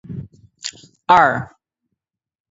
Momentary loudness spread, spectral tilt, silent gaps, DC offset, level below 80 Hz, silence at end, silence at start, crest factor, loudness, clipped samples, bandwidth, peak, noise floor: 21 LU; -4 dB/octave; none; under 0.1%; -54 dBFS; 1.05 s; 0.1 s; 20 dB; -15 LUFS; under 0.1%; 8 kHz; 0 dBFS; -79 dBFS